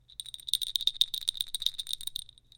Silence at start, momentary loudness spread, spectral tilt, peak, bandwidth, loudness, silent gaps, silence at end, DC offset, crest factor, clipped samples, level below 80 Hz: 0.2 s; 13 LU; 3 dB/octave; -8 dBFS; 17 kHz; -30 LUFS; none; 0.3 s; under 0.1%; 26 dB; under 0.1%; -60 dBFS